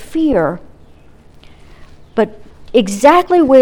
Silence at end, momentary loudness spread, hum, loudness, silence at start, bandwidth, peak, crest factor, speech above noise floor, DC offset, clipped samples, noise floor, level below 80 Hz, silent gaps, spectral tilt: 0 s; 11 LU; none; -13 LUFS; 0 s; 18.5 kHz; 0 dBFS; 14 dB; 31 dB; under 0.1%; 0.2%; -41 dBFS; -40 dBFS; none; -5.5 dB/octave